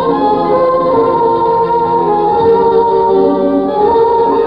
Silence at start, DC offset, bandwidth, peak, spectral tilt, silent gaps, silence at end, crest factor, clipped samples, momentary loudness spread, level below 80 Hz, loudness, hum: 0 s; 0.3%; 5.4 kHz; 0 dBFS; -9 dB/octave; none; 0 s; 10 dB; under 0.1%; 2 LU; -40 dBFS; -11 LUFS; none